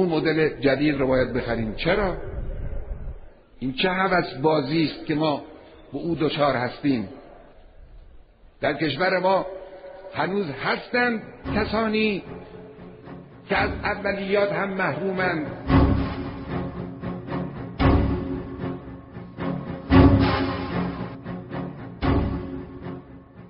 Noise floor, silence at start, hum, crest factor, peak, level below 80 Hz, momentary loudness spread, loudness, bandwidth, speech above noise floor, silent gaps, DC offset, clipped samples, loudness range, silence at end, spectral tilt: -49 dBFS; 0 s; none; 22 dB; -2 dBFS; -36 dBFS; 17 LU; -24 LUFS; 5.6 kHz; 25 dB; none; under 0.1%; under 0.1%; 4 LU; 0 s; -5 dB/octave